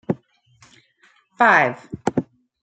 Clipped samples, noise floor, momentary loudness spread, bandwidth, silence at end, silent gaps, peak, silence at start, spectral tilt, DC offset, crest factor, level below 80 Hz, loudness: under 0.1%; -58 dBFS; 14 LU; 9.2 kHz; 0.4 s; none; -2 dBFS; 0.1 s; -6 dB/octave; under 0.1%; 20 dB; -62 dBFS; -19 LUFS